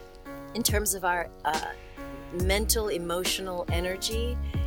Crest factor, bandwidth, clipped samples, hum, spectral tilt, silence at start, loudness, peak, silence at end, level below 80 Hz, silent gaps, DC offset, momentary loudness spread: 20 dB; 19.5 kHz; under 0.1%; none; -3.5 dB/octave; 0 s; -28 LUFS; -10 dBFS; 0 s; -36 dBFS; none; under 0.1%; 16 LU